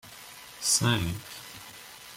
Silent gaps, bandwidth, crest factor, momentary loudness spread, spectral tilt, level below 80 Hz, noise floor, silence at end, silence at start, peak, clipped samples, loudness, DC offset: none; 16.5 kHz; 20 dB; 21 LU; -2.5 dB/octave; -56 dBFS; -47 dBFS; 0 s; 0.05 s; -12 dBFS; under 0.1%; -27 LUFS; under 0.1%